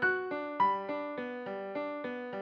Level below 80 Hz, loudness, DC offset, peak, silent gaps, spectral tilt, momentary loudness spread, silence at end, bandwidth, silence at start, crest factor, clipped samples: -74 dBFS; -35 LUFS; under 0.1%; -18 dBFS; none; -7 dB/octave; 9 LU; 0 s; 6.6 kHz; 0 s; 16 dB; under 0.1%